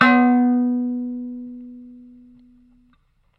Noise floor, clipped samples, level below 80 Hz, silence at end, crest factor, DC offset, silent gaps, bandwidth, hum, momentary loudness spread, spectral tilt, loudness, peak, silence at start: -61 dBFS; under 0.1%; -62 dBFS; 1.4 s; 20 dB; under 0.1%; none; 5.6 kHz; none; 24 LU; -6.5 dB/octave; -19 LUFS; 0 dBFS; 0 s